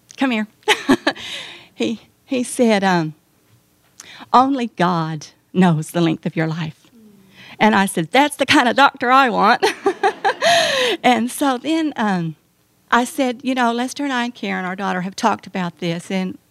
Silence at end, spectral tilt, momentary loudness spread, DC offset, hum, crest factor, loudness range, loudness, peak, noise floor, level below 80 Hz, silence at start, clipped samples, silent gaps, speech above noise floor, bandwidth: 0.2 s; -4.5 dB/octave; 11 LU; under 0.1%; none; 18 dB; 6 LU; -18 LUFS; 0 dBFS; -59 dBFS; -62 dBFS; 0.2 s; under 0.1%; none; 41 dB; 14.5 kHz